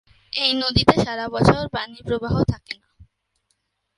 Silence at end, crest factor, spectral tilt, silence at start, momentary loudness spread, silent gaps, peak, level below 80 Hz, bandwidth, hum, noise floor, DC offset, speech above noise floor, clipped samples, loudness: 0.95 s; 22 dB; -6 dB/octave; 0.35 s; 13 LU; none; 0 dBFS; -40 dBFS; 11.5 kHz; none; -72 dBFS; under 0.1%; 52 dB; under 0.1%; -20 LUFS